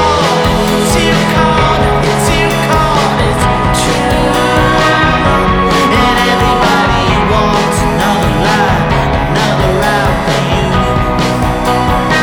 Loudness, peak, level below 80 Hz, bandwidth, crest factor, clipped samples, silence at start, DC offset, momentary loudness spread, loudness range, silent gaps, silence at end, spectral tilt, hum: -10 LUFS; 0 dBFS; -22 dBFS; over 20 kHz; 10 dB; under 0.1%; 0 s; under 0.1%; 3 LU; 2 LU; none; 0 s; -5 dB/octave; none